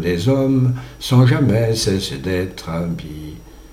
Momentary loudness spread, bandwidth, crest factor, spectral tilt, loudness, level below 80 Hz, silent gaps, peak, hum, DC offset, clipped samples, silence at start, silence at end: 14 LU; 15 kHz; 16 dB; -6.5 dB/octave; -18 LUFS; -40 dBFS; none; -2 dBFS; none; under 0.1%; under 0.1%; 0 s; 0 s